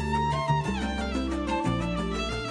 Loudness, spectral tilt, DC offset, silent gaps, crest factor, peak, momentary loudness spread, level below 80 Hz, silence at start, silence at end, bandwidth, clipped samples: -28 LUFS; -6 dB/octave; under 0.1%; none; 16 dB; -12 dBFS; 3 LU; -38 dBFS; 0 s; 0 s; 10.5 kHz; under 0.1%